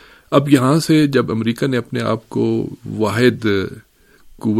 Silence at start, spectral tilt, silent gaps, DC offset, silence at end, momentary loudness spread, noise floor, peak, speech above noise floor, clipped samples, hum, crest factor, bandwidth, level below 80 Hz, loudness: 0.3 s; -6.5 dB/octave; none; under 0.1%; 0 s; 8 LU; -46 dBFS; 0 dBFS; 30 dB; under 0.1%; none; 18 dB; 15 kHz; -52 dBFS; -17 LUFS